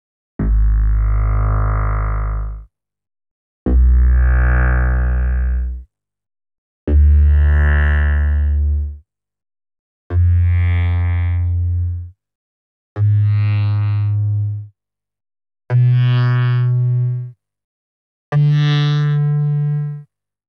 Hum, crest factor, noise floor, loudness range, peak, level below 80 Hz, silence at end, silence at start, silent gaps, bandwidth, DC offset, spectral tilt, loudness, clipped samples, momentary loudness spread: none; 12 dB; -66 dBFS; 3 LU; -4 dBFS; -18 dBFS; 0.45 s; 0.4 s; 3.31-3.66 s, 6.58-6.87 s, 9.79-10.10 s, 12.35-12.96 s, 17.64-18.32 s; 5.2 kHz; under 0.1%; -9 dB/octave; -17 LUFS; under 0.1%; 13 LU